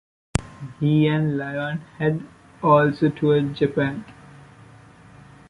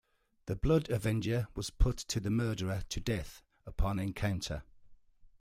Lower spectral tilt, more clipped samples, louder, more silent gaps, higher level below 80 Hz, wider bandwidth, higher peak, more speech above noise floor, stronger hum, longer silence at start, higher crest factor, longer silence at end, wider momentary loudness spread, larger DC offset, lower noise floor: about the same, -7 dB/octave vs -6 dB/octave; neither; first, -22 LUFS vs -35 LUFS; neither; second, -46 dBFS vs -40 dBFS; second, 11.5 kHz vs 15.5 kHz; first, -4 dBFS vs -14 dBFS; about the same, 27 dB vs 25 dB; neither; about the same, 0.35 s vs 0.45 s; about the same, 20 dB vs 20 dB; first, 1.35 s vs 0.15 s; about the same, 12 LU vs 13 LU; neither; second, -47 dBFS vs -57 dBFS